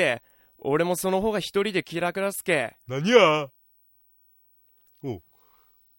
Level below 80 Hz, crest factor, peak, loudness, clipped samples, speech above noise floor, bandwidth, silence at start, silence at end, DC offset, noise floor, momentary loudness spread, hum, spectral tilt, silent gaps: -60 dBFS; 24 dB; -2 dBFS; -24 LUFS; under 0.1%; 38 dB; 16.5 kHz; 0 s; 0.8 s; under 0.1%; -62 dBFS; 18 LU; none; -4.5 dB/octave; none